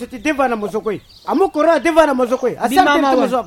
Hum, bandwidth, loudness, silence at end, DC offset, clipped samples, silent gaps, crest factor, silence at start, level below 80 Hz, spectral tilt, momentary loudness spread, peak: none; 17 kHz; -15 LUFS; 0 s; under 0.1%; under 0.1%; none; 16 dB; 0 s; -46 dBFS; -4.5 dB/octave; 9 LU; 0 dBFS